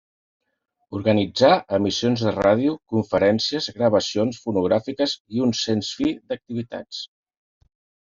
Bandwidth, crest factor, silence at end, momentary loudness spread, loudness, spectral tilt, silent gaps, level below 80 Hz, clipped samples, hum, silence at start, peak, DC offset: 7.6 kHz; 20 dB; 1 s; 13 LU; -22 LUFS; -5.5 dB/octave; 5.20-5.25 s; -58 dBFS; under 0.1%; none; 0.9 s; -4 dBFS; under 0.1%